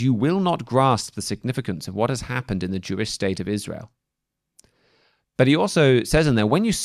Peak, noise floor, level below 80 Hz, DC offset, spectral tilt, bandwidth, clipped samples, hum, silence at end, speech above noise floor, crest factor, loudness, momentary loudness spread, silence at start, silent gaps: -4 dBFS; -82 dBFS; -44 dBFS; under 0.1%; -5.5 dB/octave; 14 kHz; under 0.1%; none; 0 s; 61 dB; 18 dB; -22 LUFS; 11 LU; 0 s; none